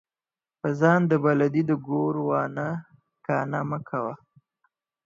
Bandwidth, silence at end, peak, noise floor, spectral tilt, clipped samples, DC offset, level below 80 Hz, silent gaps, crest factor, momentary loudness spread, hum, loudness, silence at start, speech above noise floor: 7.4 kHz; 0.9 s; -6 dBFS; under -90 dBFS; -9 dB/octave; under 0.1%; under 0.1%; -70 dBFS; none; 20 dB; 12 LU; none; -25 LUFS; 0.65 s; over 66 dB